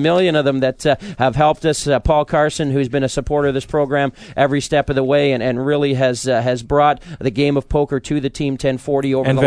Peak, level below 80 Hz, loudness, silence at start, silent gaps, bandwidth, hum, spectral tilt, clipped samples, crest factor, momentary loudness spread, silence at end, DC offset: 0 dBFS; -36 dBFS; -17 LUFS; 0 s; none; 11 kHz; none; -6 dB/octave; under 0.1%; 16 dB; 5 LU; 0 s; under 0.1%